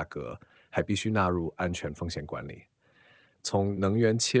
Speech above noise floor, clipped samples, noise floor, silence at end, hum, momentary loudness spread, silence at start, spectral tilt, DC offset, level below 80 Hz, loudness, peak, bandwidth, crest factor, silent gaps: 33 dB; under 0.1%; -62 dBFS; 0 s; none; 15 LU; 0 s; -5 dB/octave; under 0.1%; -48 dBFS; -30 LUFS; -10 dBFS; 8 kHz; 20 dB; none